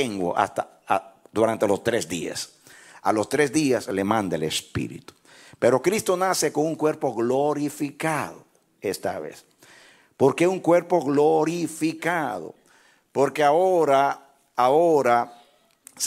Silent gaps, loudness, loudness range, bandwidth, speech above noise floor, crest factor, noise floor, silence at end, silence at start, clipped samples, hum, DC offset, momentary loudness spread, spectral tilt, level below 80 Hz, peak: none; -23 LUFS; 4 LU; 16 kHz; 36 dB; 18 dB; -58 dBFS; 0 s; 0 s; under 0.1%; none; under 0.1%; 13 LU; -4.5 dB/octave; -64 dBFS; -6 dBFS